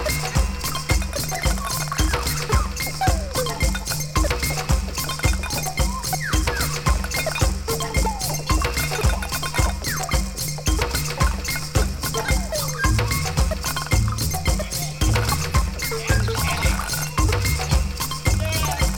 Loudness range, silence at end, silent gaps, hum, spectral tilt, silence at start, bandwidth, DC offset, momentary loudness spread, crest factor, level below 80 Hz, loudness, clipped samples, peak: 1 LU; 0 s; none; none; -3.5 dB/octave; 0 s; 19 kHz; under 0.1%; 3 LU; 18 dB; -26 dBFS; -23 LUFS; under 0.1%; -4 dBFS